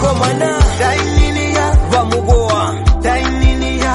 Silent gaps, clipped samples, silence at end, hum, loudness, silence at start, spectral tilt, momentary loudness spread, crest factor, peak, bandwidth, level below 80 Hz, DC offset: none; under 0.1%; 0 s; none; -14 LUFS; 0 s; -5.5 dB/octave; 2 LU; 12 dB; 0 dBFS; 11.5 kHz; -16 dBFS; under 0.1%